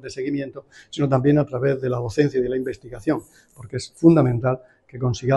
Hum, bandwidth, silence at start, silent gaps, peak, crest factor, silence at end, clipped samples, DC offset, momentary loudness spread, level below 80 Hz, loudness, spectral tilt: none; 12 kHz; 0.05 s; none; -2 dBFS; 20 dB; 0 s; under 0.1%; under 0.1%; 15 LU; -50 dBFS; -22 LUFS; -7.5 dB/octave